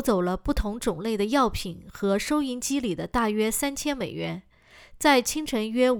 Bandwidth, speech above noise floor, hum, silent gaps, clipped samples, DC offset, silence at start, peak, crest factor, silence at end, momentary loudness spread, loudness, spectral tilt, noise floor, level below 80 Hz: over 20 kHz; 26 dB; none; none; under 0.1%; under 0.1%; 0 s; -6 dBFS; 20 dB; 0 s; 9 LU; -26 LUFS; -4 dB/octave; -51 dBFS; -40 dBFS